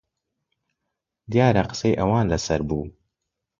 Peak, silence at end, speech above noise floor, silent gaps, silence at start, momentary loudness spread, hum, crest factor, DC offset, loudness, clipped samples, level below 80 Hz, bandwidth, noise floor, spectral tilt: -4 dBFS; 0.7 s; 61 dB; none; 1.3 s; 10 LU; none; 20 dB; under 0.1%; -22 LUFS; under 0.1%; -42 dBFS; 7.6 kHz; -82 dBFS; -6.5 dB/octave